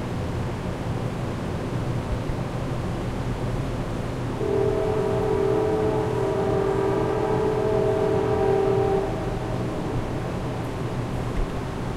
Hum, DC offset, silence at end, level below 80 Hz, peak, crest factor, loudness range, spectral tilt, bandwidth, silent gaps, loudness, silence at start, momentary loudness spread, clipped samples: none; under 0.1%; 0 s; -36 dBFS; -10 dBFS; 14 dB; 6 LU; -7.5 dB/octave; 14 kHz; none; -25 LUFS; 0 s; 7 LU; under 0.1%